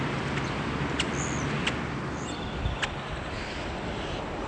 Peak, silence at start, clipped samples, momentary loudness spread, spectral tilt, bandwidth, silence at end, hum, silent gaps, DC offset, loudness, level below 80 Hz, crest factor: -14 dBFS; 0 s; under 0.1%; 5 LU; -4.5 dB/octave; 10 kHz; 0 s; none; none; under 0.1%; -31 LUFS; -42 dBFS; 18 dB